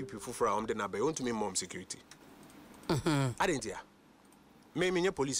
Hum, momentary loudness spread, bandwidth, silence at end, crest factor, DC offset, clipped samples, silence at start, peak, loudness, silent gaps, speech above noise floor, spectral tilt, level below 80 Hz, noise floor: none; 21 LU; 16 kHz; 0 s; 16 dB; under 0.1%; under 0.1%; 0 s; -18 dBFS; -34 LUFS; none; 28 dB; -4.5 dB/octave; -60 dBFS; -61 dBFS